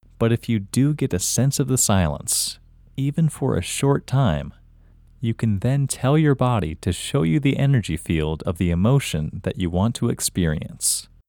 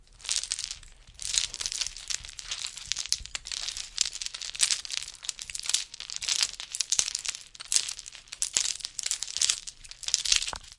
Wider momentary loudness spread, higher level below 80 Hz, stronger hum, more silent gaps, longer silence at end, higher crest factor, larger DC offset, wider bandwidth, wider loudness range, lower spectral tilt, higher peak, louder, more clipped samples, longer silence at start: second, 7 LU vs 10 LU; first, -40 dBFS vs -56 dBFS; neither; neither; first, 0.25 s vs 0.05 s; second, 16 dB vs 32 dB; neither; first, 19 kHz vs 12 kHz; about the same, 2 LU vs 3 LU; first, -5 dB/octave vs 3 dB/octave; second, -4 dBFS vs 0 dBFS; first, -21 LUFS vs -29 LUFS; neither; first, 0.2 s vs 0 s